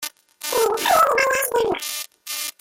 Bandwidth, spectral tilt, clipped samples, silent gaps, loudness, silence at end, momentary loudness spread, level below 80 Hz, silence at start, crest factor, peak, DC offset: 17 kHz; -0.5 dB/octave; under 0.1%; none; -20 LUFS; 0.1 s; 13 LU; -58 dBFS; 0 s; 18 dB; -4 dBFS; under 0.1%